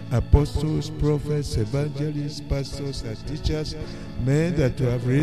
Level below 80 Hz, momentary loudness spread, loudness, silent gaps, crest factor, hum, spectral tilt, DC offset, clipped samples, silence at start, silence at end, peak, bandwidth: -32 dBFS; 10 LU; -25 LUFS; none; 20 dB; none; -7 dB/octave; 0.8%; under 0.1%; 0 s; 0 s; -4 dBFS; 13 kHz